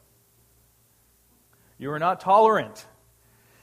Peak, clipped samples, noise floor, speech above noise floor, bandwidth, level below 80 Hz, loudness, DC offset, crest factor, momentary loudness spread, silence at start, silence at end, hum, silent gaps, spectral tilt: -6 dBFS; under 0.1%; -62 dBFS; 41 dB; 15.5 kHz; -68 dBFS; -21 LUFS; under 0.1%; 20 dB; 20 LU; 1.8 s; 0.8 s; none; none; -5.5 dB/octave